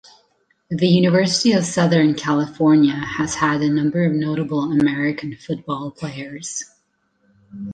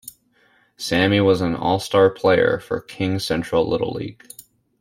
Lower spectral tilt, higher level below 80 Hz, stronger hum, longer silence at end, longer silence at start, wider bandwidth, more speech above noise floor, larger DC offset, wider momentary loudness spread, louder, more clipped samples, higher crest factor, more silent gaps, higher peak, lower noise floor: about the same, -5.5 dB/octave vs -5.5 dB/octave; about the same, -56 dBFS vs -52 dBFS; neither; second, 0 s vs 0.4 s; first, 0.7 s vs 0.05 s; second, 9.8 kHz vs 16 kHz; first, 47 dB vs 40 dB; neither; about the same, 14 LU vs 15 LU; about the same, -19 LUFS vs -19 LUFS; neither; about the same, 16 dB vs 16 dB; neither; about the same, -2 dBFS vs -4 dBFS; first, -65 dBFS vs -59 dBFS